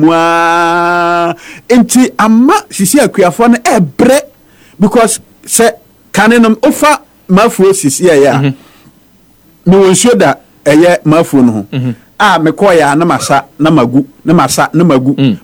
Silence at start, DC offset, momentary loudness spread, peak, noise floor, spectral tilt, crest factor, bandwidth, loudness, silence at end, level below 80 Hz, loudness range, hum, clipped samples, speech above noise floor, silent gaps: 0 s; under 0.1%; 6 LU; 0 dBFS; -44 dBFS; -5 dB/octave; 8 dB; 19 kHz; -8 LUFS; 0.05 s; -44 dBFS; 1 LU; none; 2%; 37 dB; none